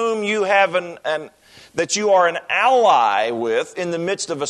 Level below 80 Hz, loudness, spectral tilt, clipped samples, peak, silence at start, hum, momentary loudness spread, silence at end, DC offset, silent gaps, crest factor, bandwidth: -68 dBFS; -18 LUFS; -3 dB/octave; under 0.1%; -2 dBFS; 0 s; none; 11 LU; 0 s; under 0.1%; none; 16 dB; 12 kHz